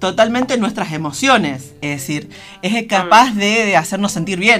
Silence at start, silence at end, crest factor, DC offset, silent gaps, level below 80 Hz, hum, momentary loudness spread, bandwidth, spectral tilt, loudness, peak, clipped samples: 0 s; 0 s; 16 dB; under 0.1%; none; -52 dBFS; none; 13 LU; 16 kHz; -4 dB/octave; -15 LUFS; 0 dBFS; under 0.1%